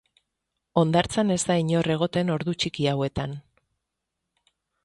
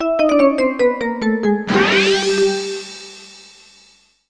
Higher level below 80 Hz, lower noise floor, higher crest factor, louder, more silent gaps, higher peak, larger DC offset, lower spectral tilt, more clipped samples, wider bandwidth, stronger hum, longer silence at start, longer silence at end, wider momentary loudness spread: about the same, -52 dBFS vs -50 dBFS; first, -82 dBFS vs -52 dBFS; about the same, 20 dB vs 16 dB; second, -25 LUFS vs -16 LUFS; neither; second, -6 dBFS vs -2 dBFS; neither; first, -5.5 dB/octave vs -4 dB/octave; neither; about the same, 11.5 kHz vs 10.5 kHz; neither; first, 0.75 s vs 0 s; first, 1.45 s vs 0.9 s; second, 7 LU vs 18 LU